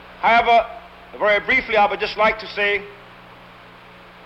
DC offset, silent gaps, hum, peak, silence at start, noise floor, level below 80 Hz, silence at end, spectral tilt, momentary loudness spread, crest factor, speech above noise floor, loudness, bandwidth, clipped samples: under 0.1%; none; none; -6 dBFS; 0.05 s; -44 dBFS; -50 dBFS; 1.3 s; -4.5 dB/octave; 12 LU; 14 dB; 25 dB; -18 LUFS; 8 kHz; under 0.1%